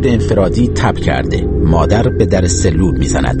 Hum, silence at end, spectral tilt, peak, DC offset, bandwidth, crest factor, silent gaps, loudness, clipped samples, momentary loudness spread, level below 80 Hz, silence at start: none; 0 s; -6 dB/octave; 0 dBFS; under 0.1%; 8.8 kHz; 12 dB; none; -13 LUFS; under 0.1%; 3 LU; -20 dBFS; 0 s